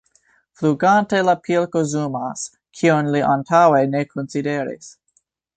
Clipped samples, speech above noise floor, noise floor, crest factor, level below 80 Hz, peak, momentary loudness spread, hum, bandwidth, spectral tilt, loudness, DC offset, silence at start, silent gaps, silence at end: under 0.1%; 47 dB; -66 dBFS; 18 dB; -62 dBFS; -2 dBFS; 12 LU; none; 9.2 kHz; -6 dB/octave; -18 LUFS; under 0.1%; 0.6 s; none; 0.65 s